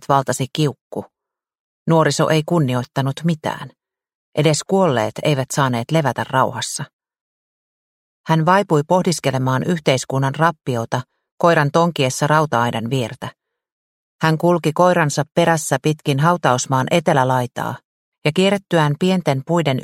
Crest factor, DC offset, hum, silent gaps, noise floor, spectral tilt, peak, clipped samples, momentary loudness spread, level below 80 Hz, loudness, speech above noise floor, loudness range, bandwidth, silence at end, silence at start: 18 dB; under 0.1%; none; 0.81-0.90 s, 1.60-1.86 s, 4.15-4.32 s, 6.93-6.99 s, 7.21-8.24 s, 11.32-11.38 s, 13.72-14.19 s, 17.85-18.12 s; under -90 dBFS; -5.5 dB/octave; 0 dBFS; under 0.1%; 11 LU; -58 dBFS; -18 LUFS; over 73 dB; 3 LU; 16 kHz; 0 s; 0.1 s